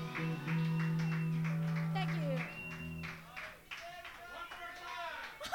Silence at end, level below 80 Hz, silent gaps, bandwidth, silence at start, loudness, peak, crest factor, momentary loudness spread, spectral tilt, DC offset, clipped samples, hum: 0 s; -66 dBFS; none; 16 kHz; 0 s; -39 LUFS; -22 dBFS; 18 dB; 12 LU; -6.5 dB/octave; under 0.1%; under 0.1%; none